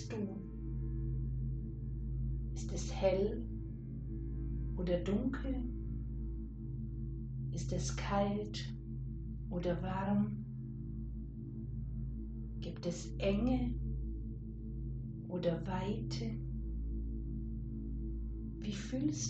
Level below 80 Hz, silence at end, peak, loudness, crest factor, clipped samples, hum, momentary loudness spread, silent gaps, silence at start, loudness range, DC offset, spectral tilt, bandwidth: -44 dBFS; 0 s; -20 dBFS; -40 LUFS; 18 dB; under 0.1%; none; 10 LU; none; 0 s; 3 LU; under 0.1%; -6.5 dB/octave; 8.4 kHz